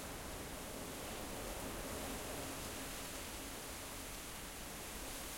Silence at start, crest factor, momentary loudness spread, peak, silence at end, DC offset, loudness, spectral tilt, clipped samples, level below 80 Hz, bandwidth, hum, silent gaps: 0 s; 14 dB; 3 LU; -32 dBFS; 0 s; under 0.1%; -46 LUFS; -3 dB/octave; under 0.1%; -56 dBFS; 16.5 kHz; none; none